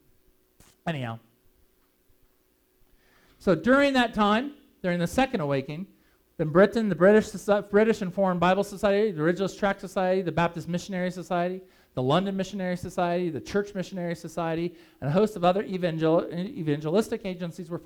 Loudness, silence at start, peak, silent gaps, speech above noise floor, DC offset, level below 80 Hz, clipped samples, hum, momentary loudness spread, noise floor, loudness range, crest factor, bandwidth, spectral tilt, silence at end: -26 LUFS; 0.85 s; -6 dBFS; none; 41 dB; under 0.1%; -56 dBFS; under 0.1%; none; 13 LU; -67 dBFS; 6 LU; 20 dB; 17 kHz; -6.5 dB/octave; 0.05 s